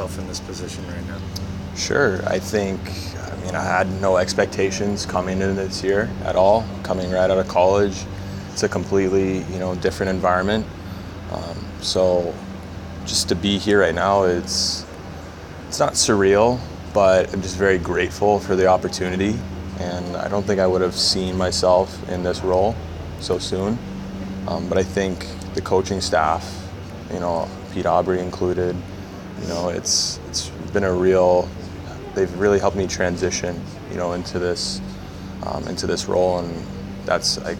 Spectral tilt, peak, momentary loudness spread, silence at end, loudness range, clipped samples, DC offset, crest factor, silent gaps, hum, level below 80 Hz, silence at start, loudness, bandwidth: -4.5 dB/octave; -2 dBFS; 14 LU; 0 s; 5 LU; under 0.1%; under 0.1%; 20 dB; none; none; -40 dBFS; 0 s; -21 LUFS; 17 kHz